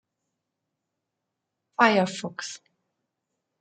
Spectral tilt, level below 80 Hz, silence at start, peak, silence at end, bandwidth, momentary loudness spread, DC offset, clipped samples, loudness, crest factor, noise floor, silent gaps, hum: -4.5 dB/octave; -80 dBFS; 1.8 s; -4 dBFS; 1.05 s; 9.4 kHz; 17 LU; under 0.1%; under 0.1%; -23 LUFS; 26 dB; -83 dBFS; none; none